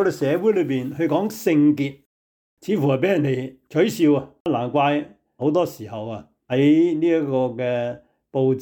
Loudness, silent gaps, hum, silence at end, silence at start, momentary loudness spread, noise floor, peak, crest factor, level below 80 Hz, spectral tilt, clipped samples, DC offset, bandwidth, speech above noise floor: -21 LUFS; 2.06-2.57 s, 4.40-4.45 s; none; 0 s; 0 s; 13 LU; under -90 dBFS; -8 dBFS; 12 dB; -64 dBFS; -7 dB/octave; under 0.1%; under 0.1%; 19.5 kHz; over 70 dB